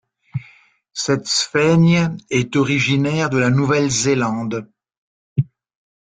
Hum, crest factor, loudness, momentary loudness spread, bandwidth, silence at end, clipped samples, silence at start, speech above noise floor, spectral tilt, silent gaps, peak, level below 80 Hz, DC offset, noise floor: none; 14 dB; -18 LUFS; 15 LU; 9.4 kHz; 0.65 s; under 0.1%; 0.35 s; 35 dB; -5 dB/octave; 4.97-5.36 s; -4 dBFS; -54 dBFS; under 0.1%; -51 dBFS